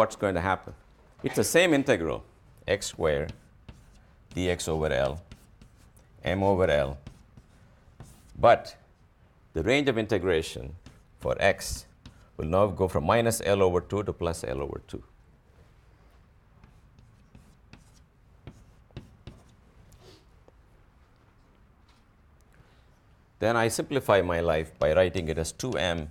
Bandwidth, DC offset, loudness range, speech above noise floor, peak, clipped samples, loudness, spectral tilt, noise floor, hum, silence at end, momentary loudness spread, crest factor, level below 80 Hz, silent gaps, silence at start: 17.5 kHz; under 0.1%; 6 LU; 33 dB; -8 dBFS; under 0.1%; -27 LUFS; -5 dB/octave; -59 dBFS; none; 0 s; 17 LU; 22 dB; -48 dBFS; none; 0 s